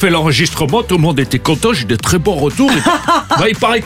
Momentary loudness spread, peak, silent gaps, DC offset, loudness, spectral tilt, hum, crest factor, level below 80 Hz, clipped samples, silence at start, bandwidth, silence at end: 3 LU; 0 dBFS; none; under 0.1%; -12 LUFS; -4.5 dB/octave; none; 12 dB; -34 dBFS; under 0.1%; 0 s; 16 kHz; 0 s